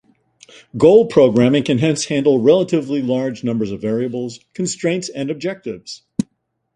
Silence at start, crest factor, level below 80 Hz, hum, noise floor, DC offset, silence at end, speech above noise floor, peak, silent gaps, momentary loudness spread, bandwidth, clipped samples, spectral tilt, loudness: 0.75 s; 16 dB; -56 dBFS; none; -67 dBFS; under 0.1%; 0.5 s; 51 dB; 0 dBFS; none; 15 LU; 11 kHz; under 0.1%; -6 dB/octave; -17 LUFS